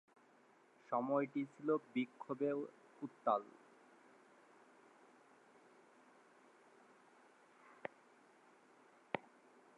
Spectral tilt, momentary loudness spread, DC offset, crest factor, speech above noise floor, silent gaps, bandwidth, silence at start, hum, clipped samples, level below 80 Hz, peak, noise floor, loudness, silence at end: -7 dB/octave; 27 LU; under 0.1%; 26 dB; 29 dB; none; 10.5 kHz; 0.9 s; none; under 0.1%; under -90 dBFS; -20 dBFS; -69 dBFS; -42 LUFS; 0.55 s